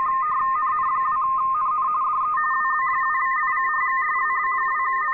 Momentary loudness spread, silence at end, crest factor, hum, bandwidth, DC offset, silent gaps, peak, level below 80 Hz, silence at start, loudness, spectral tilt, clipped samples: 1 LU; 0 s; 8 dB; none; 4 kHz; under 0.1%; none; -14 dBFS; -60 dBFS; 0 s; -21 LUFS; -5.5 dB/octave; under 0.1%